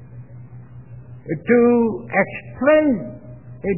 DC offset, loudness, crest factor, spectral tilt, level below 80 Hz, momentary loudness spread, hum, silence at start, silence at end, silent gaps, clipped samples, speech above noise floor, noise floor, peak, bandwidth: 0.4%; -18 LUFS; 18 dB; -11 dB/octave; -50 dBFS; 25 LU; none; 0 s; 0 s; none; under 0.1%; 22 dB; -39 dBFS; -4 dBFS; 3 kHz